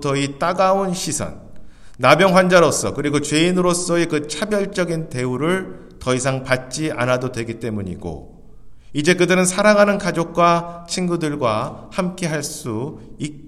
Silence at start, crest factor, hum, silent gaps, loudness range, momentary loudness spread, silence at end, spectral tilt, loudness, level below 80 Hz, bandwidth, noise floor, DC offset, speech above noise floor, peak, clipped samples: 0 s; 18 dB; none; none; 6 LU; 14 LU; 0 s; -4.5 dB/octave; -18 LUFS; -46 dBFS; 14.5 kHz; -42 dBFS; under 0.1%; 23 dB; 0 dBFS; under 0.1%